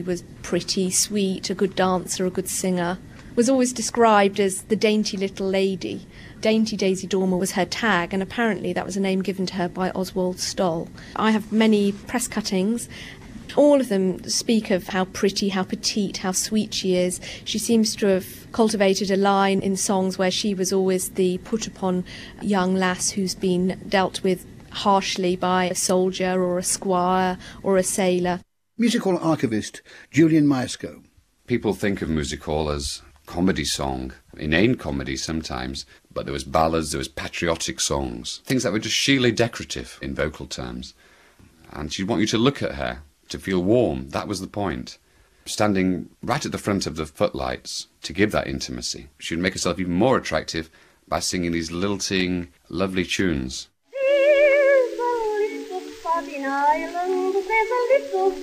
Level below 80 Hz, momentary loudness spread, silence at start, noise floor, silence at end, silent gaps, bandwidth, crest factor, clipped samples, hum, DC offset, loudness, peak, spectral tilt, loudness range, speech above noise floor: -46 dBFS; 12 LU; 0 s; -53 dBFS; 0 s; none; 15.5 kHz; 20 dB; under 0.1%; none; under 0.1%; -23 LUFS; -2 dBFS; -4.5 dB/octave; 4 LU; 30 dB